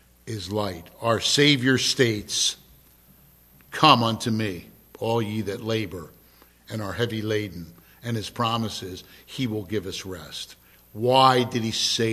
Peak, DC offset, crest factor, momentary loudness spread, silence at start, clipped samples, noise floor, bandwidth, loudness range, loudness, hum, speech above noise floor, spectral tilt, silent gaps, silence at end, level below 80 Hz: 0 dBFS; under 0.1%; 26 dB; 20 LU; 0.25 s; under 0.1%; -55 dBFS; 15 kHz; 8 LU; -23 LUFS; none; 31 dB; -4 dB/octave; none; 0 s; -54 dBFS